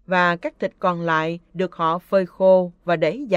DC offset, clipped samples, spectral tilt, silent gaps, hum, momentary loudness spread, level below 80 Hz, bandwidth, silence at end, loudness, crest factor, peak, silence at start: under 0.1%; under 0.1%; -7 dB/octave; none; none; 10 LU; -60 dBFS; 7.6 kHz; 0 s; -21 LUFS; 16 dB; -4 dBFS; 0.1 s